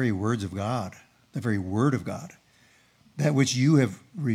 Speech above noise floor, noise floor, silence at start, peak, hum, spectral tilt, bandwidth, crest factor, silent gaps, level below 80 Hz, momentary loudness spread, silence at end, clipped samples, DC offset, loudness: 35 dB; -60 dBFS; 0 s; -8 dBFS; none; -6 dB/octave; 13.5 kHz; 18 dB; none; -70 dBFS; 17 LU; 0 s; under 0.1%; under 0.1%; -26 LUFS